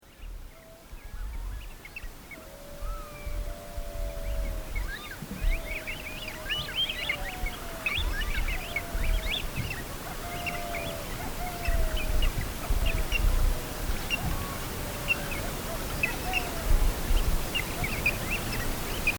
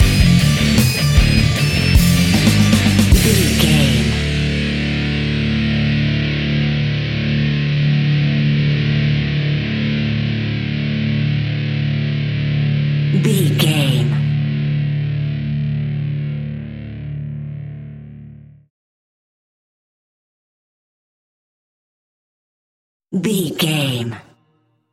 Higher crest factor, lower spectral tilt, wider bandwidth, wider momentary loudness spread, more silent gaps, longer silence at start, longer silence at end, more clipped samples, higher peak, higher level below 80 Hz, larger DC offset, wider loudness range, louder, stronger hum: about the same, 18 dB vs 16 dB; second, -3.5 dB/octave vs -5.5 dB/octave; first, over 20 kHz vs 17 kHz; about the same, 14 LU vs 13 LU; second, none vs 18.70-23.00 s; about the same, 0.05 s vs 0 s; second, 0 s vs 0.7 s; neither; second, -12 dBFS vs 0 dBFS; about the same, -32 dBFS vs -28 dBFS; neither; second, 10 LU vs 14 LU; second, -32 LUFS vs -16 LUFS; neither